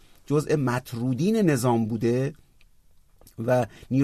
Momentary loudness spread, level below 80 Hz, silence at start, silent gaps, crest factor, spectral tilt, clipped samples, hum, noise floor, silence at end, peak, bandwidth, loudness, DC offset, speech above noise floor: 7 LU; -56 dBFS; 0.3 s; none; 16 dB; -7 dB/octave; under 0.1%; none; -56 dBFS; 0 s; -8 dBFS; 13.5 kHz; -25 LUFS; under 0.1%; 32 dB